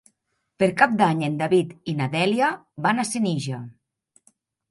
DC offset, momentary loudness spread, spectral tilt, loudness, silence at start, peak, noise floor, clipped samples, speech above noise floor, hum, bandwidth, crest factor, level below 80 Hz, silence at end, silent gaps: under 0.1%; 10 LU; -5.5 dB/octave; -22 LUFS; 0.6 s; -2 dBFS; -74 dBFS; under 0.1%; 52 dB; none; 11.5 kHz; 22 dB; -64 dBFS; 1 s; none